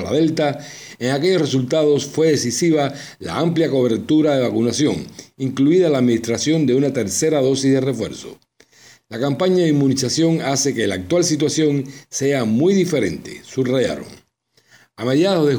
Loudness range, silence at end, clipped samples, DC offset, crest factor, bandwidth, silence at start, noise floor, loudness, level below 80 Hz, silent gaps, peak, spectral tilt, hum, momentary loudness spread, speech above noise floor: 2 LU; 0 s; under 0.1%; under 0.1%; 12 dB; over 20 kHz; 0 s; -60 dBFS; -18 LUFS; -56 dBFS; none; -6 dBFS; -5 dB/octave; none; 11 LU; 43 dB